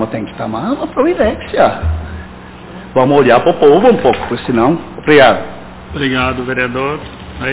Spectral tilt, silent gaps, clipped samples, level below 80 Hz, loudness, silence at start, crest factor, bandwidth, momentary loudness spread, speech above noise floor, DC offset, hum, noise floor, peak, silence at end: -10 dB/octave; none; 0.3%; -30 dBFS; -12 LUFS; 0 s; 12 dB; 4 kHz; 21 LU; 20 dB; under 0.1%; none; -32 dBFS; 0 dBFS; 0 s